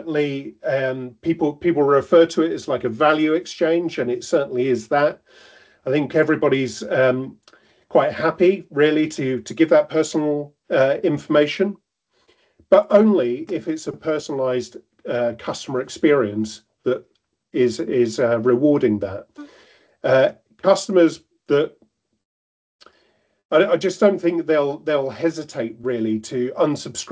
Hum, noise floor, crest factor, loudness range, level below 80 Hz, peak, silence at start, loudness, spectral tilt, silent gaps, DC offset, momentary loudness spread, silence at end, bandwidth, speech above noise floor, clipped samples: none; -63 dBFS; 20 dB; 4 LU; -60 dBFS; 0 dBFS; 0 s; -20 LUFS; -5.5 dB/octave; 22.25-22.79 s, 23.45-23.49 s; under 0.1%; 10 LU; 0 s; 8 kHz; 44 dB; under 0.1%